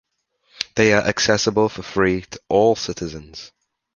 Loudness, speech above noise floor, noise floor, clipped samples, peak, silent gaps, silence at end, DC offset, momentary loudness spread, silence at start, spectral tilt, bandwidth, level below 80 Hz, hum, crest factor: -19 LUFS; 45 dB; -64 dBFS; under 0.1%; 0 dBFS; none; 0.5 s; under 0.1%; 15 LU; 0.6 s; -4 dB/octave; 7.4 kHz; -48 dBFS; none; 20 dB